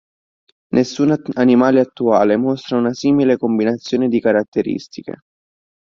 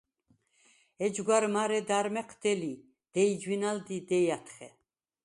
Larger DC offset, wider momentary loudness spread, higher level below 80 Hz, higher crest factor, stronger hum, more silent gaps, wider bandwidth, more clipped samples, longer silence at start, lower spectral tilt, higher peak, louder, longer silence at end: neither; second, 9 LU vs 12 LU; first, -56 dBFS vs -76 dBFS; about the same, 16 dB vs 20 dB; neither; first, 4.48-4.52 s vs none; second, 7.4 kHz vs 11.5 kHz; neither; second, 0.75 s vs 1 s; first, -6.5 dB/octave vs -4.5 dB/octave; first, -2 dBFS vs -12 dBFS; first, -16 LUFS vs -31 LUFS; first, 0.75 s vs 0.55 s